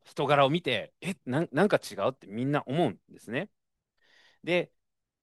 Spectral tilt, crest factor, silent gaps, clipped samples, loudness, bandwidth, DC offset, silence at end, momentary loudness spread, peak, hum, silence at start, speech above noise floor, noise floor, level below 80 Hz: -6 dB/octave; 20 dB; none; under 0.1%; -29 LUFS; 12.5 kHz; under 0.1%; 0.6 s; 13 LU; -10 dBFS; none; 0.15 s; 45 dB; -73 dBFS; -74 dBFS